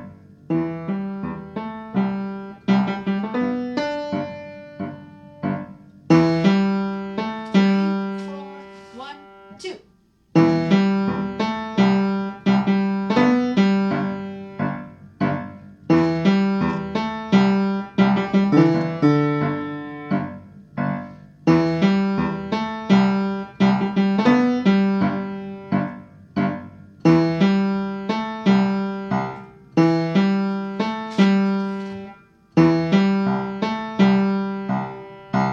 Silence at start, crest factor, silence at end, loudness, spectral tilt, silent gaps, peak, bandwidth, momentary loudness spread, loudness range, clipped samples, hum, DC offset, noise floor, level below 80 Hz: 0 s; 18 dB; 0 s; -21 LUFS; -8 dB/octave; none; -4 dBFS; 7.2 kHz; 16 LU; 5 LU; under 0.1%; none; under 0.1%; -58 dBFS; -56 dBFS